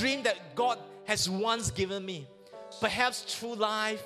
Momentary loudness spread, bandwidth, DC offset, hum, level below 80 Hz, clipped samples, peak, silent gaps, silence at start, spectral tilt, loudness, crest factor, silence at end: 13 LU; 15.5 kHz; under 0.1%; none; -56 dBFS; under 0.1%; -10 dBFS; none; 0 s; -3 dB/octave; -31 LUFS; 20 dB; 0 s